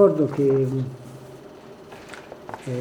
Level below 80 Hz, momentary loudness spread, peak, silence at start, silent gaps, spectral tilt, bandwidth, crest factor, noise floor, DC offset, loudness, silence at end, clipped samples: -62 dBFS; 22 LU; -2 dBFS; 0 s; none; -8.5 dB/octave; 11 kHz; 20 dB; -43 dBFS; under 0.1%; -23 LUFS; 0 s; under 0.1%